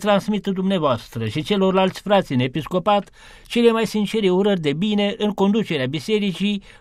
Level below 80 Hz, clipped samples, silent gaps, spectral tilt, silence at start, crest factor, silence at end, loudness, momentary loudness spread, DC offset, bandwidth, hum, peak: -50 dBFS; under 0.1%; none; -6.5 dB/octave; 0 s; 16 dB; 0.2 s; -20 LUFS; 6 LU; under 0.1%; 14 kHz; none; -4 dBFS